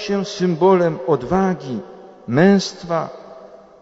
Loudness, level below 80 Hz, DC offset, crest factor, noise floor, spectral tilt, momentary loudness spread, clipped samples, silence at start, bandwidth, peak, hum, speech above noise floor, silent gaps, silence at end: -18 LUFS; -50 dBFS; under 0.1%; 16 dB; -41 dBFS; -6.5 dB/octave; 16 LU; under 0.1%; 0 s; 8 kHz; -2 dBFS; none; 24 dB; none; 0.25 s